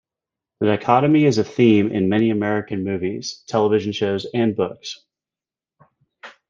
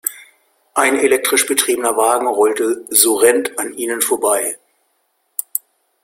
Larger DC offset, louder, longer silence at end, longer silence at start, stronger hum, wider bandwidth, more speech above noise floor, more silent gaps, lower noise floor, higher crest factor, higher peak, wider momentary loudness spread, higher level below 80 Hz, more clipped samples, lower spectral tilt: neither; second, -19 LUFS vs -15 LUFS; second, 0.2 s vs 0.45 s; first, 0.6 s vs 0.05 s; neither; second, 7.4 kHz vs 16.5 kHz; first, over 71 dB vs 50 dB; neither; first, under -90 dBFS vs -65 dBFS; about the same, 18 dB vs 18 dB; about the same, -2 dBFS vs 0 dBFS; about the same, 10 LU vs 12 LU; about the same, -62 dBFS vs -62 dBFS; neither; first, -6.5 dB/octave vs -0.5 dB/octave